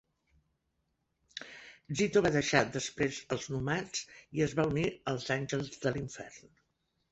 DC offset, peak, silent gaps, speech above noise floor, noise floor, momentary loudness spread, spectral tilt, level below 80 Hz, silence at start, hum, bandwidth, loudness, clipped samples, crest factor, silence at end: under 0.1%; -10 dBFS; none; 48 dB; -80 dBFS; 18 LU; -4.5 dB/octave; -60 dBFS; 1.35 s; none; 8.2 kHz; -33 LUFS; under 0.1%; 24 dB; 0.7 s